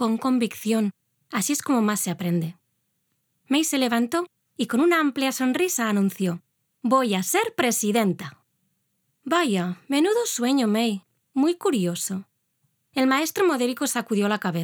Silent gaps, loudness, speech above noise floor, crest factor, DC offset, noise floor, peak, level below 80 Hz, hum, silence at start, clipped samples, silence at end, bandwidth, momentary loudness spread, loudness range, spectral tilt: none; -23 LUFS; 51 dB; 18 dB; under 0.1%; -73 dBFS; -6 dBFS; -78 dBFS; none; 0 s; under 0.1%; 0 s; over 20 kHz; 10 LU; 2 LU; -4 dB/octave